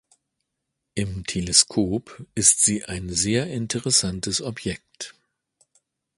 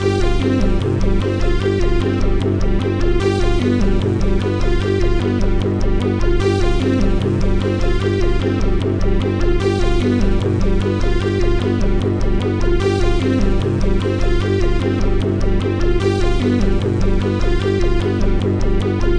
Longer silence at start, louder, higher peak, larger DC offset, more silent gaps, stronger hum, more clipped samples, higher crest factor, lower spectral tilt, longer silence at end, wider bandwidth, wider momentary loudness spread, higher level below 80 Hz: first, 0.95 s vs 0 s; second, -21 LUFS vs -18 LUFS; first, 0 dBFS vs -4 dBFS; second, under 0.1% vs 0.9%; neither; neither; neither; first, 24 dB vs 10 dB; second, -2.5 dB/octave vs -7.5 dB/octave; first, 1.05 s vs 0 s; first, 12 kHz vs 9.6 kHz; first, 17 LU vs 2 LU; second, -48 dBFS vs -18 dBFS